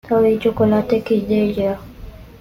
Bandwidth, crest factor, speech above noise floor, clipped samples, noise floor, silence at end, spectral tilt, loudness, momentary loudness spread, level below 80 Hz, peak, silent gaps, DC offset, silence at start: 15.5 kHz; 14 dB; 20 dB; under 0.1%; -37 dBFS; 0.05 s; -8.5 dB/octave; -17 LUFS; 7 LU; -42 dBFS; -4 dBFS; none; under 0.1%; 0.05 s